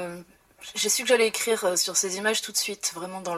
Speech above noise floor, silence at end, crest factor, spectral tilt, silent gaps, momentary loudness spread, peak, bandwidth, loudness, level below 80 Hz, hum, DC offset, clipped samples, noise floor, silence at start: 21 dB; 0 s; 20 dB; -1 dB/octave; none; 14 LU; -8 dBFS; 16 kHz; -24 LUFS; -70 dBFS; none; under 0.1%; under 0.1%; -46 dBFS; 0 s